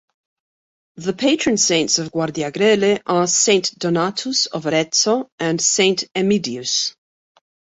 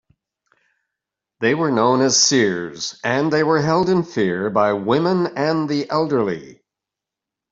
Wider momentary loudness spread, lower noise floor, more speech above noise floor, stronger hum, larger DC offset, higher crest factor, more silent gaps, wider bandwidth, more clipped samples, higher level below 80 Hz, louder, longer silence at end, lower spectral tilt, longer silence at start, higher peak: about the same, 7 LU vs 8 LU; first, under -90 dBFS vs -85 dBFS; first, over 72 dB vs 67 dB; neither; neither; about the same, 18 dB vs 18 dB; first, 5.32-5.38 s vs none; about the same, 8.2 kHz vs 7.8 kHz; neither; about the same, -60 dBFS vs -60 dBFS; about the same, -18 LUFS vs -18 LUFS; second, 0.85 s vs 1 s; about the same, -3 dB/octave vs -4 dB/octave; second, 0.95 s vs 1.4 s; about the same, -2 dBFS vs -2 dBFS